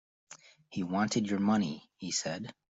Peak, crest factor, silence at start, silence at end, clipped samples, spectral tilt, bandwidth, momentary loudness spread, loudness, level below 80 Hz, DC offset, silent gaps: -16 dBFS; 18 dB; 0.3 s; 0.2 s; under 0.1%; -4.5 dB/octave; 8 kHz; 22 LU; -33 LUFS; -70 dBFS; under 0.1%; none